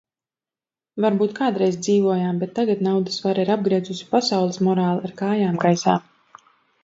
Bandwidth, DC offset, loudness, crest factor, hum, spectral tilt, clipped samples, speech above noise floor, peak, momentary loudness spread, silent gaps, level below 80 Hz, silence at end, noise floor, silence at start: 7.8 kHz; under 0.1%; -21 LUFS; 18 dB; none; -6 dB/octave; under 0.1%; over 70 dB; -2 dBFS; 5 LU; none; -68 dBFS; 0.85 s; under -90 dBFS; 0.95 s